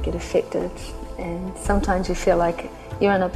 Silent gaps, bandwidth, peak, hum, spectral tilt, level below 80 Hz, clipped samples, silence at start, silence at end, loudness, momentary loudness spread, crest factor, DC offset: none; 14 kHz; -6 dBFS; none; -6 dB/octave; -32 dBFS; under 0.1%; 0 s; 0 s; -23 LUFS; 13 LU; 18 dB; under 0.1%